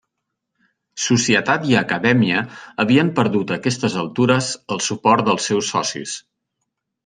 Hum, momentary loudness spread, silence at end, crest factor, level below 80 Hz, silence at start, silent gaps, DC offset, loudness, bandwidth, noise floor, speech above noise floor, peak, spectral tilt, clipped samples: none; 9 LU; 0.85 s; 18 dB; -60 dBFS; 0.95 s; none; under 0.1%; -18 LUFS; 10 kHz; -78 dBFS; 60 dB; -2 dBFS; -4.5 dB/octave; under 0.1%